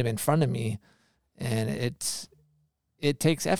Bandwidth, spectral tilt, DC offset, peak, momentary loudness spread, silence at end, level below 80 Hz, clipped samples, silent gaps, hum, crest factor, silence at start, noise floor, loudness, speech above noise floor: 18.5 kHz; -5 dB/octave; under 0.1%; -8 dBFS; 12 LU; 0 s; -62 dBFS; under 0.1%; none; none; 20 dB; 0 s; -71 dBFS; -29 LUFS; 44 dB